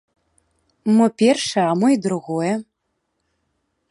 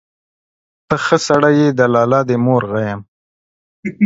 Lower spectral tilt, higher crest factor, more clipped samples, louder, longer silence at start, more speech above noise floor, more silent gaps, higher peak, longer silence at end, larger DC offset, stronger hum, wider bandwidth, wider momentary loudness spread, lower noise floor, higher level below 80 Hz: about the same, -5.5 dB/octave vs -6 dB/octave; about the same, 18 dB vs 16 dB; neither; second, -19 LUFS vs -14 LUFS; about the same, 0.85 s vs 0.9 s; second, 56 dB vs over 77 dB; second, none vs 3.08-3.83 s; second, -4 dBFS vs 0 dBFS; first, 1.3 s vs 0 s; neither; neither; first, 11.5 kHz vs 8 kHz; second, 8 LU vs 14 LU; second, -74 dBFS vs under -90 dBFS; second, -68 dBFS vs -52 dBFS